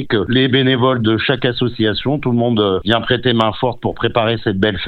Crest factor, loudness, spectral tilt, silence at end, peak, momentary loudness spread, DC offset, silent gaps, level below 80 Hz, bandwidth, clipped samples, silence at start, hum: 16 dB; -16 LUFS; -8 dB/octave; 0 s; 0 dBFS; 4 LU; under 0.1%; none; -42 dBFS; 5.8 kHz; under 0.1%; 0 s; none